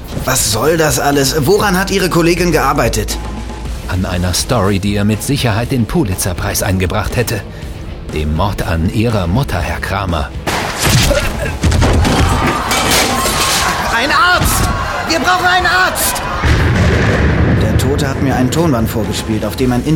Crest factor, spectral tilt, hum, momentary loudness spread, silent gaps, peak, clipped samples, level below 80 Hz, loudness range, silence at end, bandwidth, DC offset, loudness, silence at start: 14 dB; -4.5 dB/octave; none; 7 LU; none; 0 dBFS; under 0.1%; -22 dBFS; 5 LU; 0 s; 18 kHz; under 0.1%; -13 LUFS; 0 s